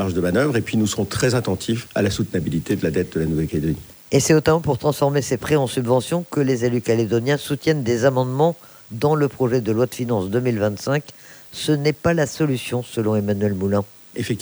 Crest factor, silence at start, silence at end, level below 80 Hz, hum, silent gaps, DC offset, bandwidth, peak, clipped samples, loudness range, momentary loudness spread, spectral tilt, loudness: 16 dB; 0 s; 0 s; -46 dBFS; none; none; under 0.1%; over 20 kHz; -4 dBFS; under 0.1%; 2 LU; 5 LU; -6 dB/octave; -21 LUFS